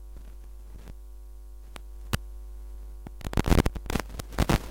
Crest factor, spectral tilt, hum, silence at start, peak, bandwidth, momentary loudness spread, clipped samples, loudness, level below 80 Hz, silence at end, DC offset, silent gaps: 26 dB; -5.5 dB/octave; none; 0 s; -6 dBFS; 17 kHz; 22 LU; under 0.1%; -30 LUFS; -34 dBFS; 0 s; under 0.1%; none